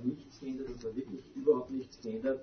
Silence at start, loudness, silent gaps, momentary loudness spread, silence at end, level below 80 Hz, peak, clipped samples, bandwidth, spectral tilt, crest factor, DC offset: 0 s; -36 LUFS; none; 12 LU; 0 s; -62 dBFS; -16 dBFS; under 0.1%; 6.4 kHz; -6.5 dB/octave; 20 dB; under 0.1%